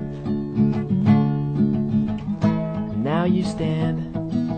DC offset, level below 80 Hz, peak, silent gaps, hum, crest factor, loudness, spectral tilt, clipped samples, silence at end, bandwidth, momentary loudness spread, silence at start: under 0.1%; -44 dBFS; -6 dBFS; none; none; 16 dB; -22 LUFS; -9 dB/octave; under 0.1%; 0 s; 9 kHz; 8 LU; 0 s